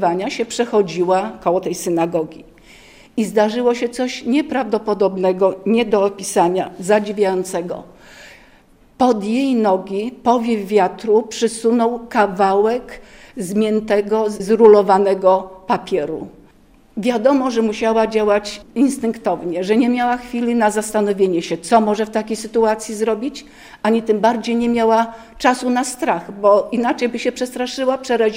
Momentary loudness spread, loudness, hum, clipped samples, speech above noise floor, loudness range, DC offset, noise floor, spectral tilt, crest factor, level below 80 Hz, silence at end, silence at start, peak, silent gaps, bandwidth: 8 LU; -17 LUFS; none; under 0.1%; 33 dB; 4 LU; under 0.1%; -50 dBFS; -5 dB/octave; 18 dB; -52 dBFS; 0 s; 0 s; 0 dBFS; none; 16 kHz